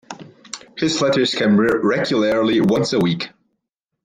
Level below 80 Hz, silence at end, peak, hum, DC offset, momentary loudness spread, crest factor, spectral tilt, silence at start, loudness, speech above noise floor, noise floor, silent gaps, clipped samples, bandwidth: -56 dBFS; 0.75 s; -6 dBFS; none; under 0.1%; 18 LU; 14 dB; -5 dB/octave; 0.1 s; -17 LUFS; 60 dB; -77 dBFS; none; under 0.1%; 10.5 kHz